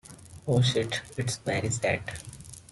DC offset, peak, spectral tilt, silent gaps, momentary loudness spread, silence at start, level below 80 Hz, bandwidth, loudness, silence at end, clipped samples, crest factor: under 0.1%; -12 dBFS; -4.5 dB/octave; none; 18 LU; 0.1 s; -56 dBFS; 12 kHz; -28 LUFS; 0.1 s; under 0.1%; 18 dB